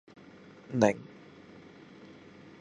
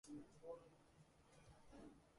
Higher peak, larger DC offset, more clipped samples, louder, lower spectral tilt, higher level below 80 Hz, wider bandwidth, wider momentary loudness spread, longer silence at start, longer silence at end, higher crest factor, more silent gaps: first, -8 dBFS vs -44 dBFS; neither; neither; first, -29 LUFS vs -61 LUFS; about the same, -6 dB/octave vs -5.5 dB/octave; first, -70 dBFS vs -78 dBFS; about the same, 10.5 kHz vs 11.5 kHz; first, 25 LU vs 10 LU; first, 0.7 s vs 0.05 s; first, 1.55 s vs 0 s; first, 26 dB vs 18 dB; neither